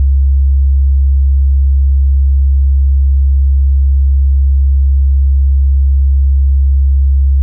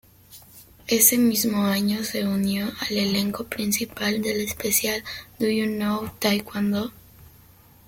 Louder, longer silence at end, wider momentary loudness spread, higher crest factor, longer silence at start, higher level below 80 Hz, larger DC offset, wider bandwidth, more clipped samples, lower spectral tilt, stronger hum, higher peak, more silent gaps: first, -12 LUFS vs -23 LUFS; second, 0 s vs 0.6 s; second, 0 LU vs 10 LU; second, 4 dB vs 22 dB; second, 0 s vs 0.3 s; first, -8 dBFS vs -56 dBFS; neither; second, 0.1 kHz vs 17 kHz; neither; first, -17 dB/octave vs -3.5 dB/octave; neither; second, -6 dBFS vs -2 dBFS; neither